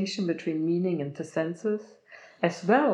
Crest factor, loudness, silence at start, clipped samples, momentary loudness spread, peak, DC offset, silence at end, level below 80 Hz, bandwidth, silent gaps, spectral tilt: 20 dB; -29 LUFS; 0 s; under 0.1%; 8 LU; -8 dBFS; under 0.1%; 0 s; under -90 dBFS; 10 kHz; none; -6.5 dB/octave